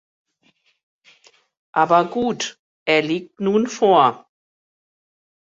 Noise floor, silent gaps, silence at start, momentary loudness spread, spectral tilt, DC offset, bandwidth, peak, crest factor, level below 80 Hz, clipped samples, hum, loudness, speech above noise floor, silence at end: -63 dBFS; 2.59-2.86 s; 1.75 s; 12 LU; -4.5 dB/octave; under 0.1%; 8 kHz; -2 dBFS; 20 dB; -66 dBFS; under 0.1%; none; -19 LUFS; 45 dB; 1.3 s